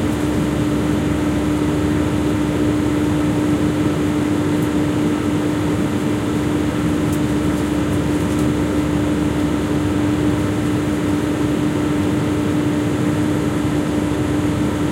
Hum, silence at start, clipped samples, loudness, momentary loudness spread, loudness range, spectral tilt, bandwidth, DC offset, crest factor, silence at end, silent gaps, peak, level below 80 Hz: none; 0 s; under 0.1%; -19 LUFS; 1 LU; 1 LU; -6.5 dB/octave; 16 kHz; under 0.1%; 12 dB; 0 s; none; -4 dBFS; -34 dBFS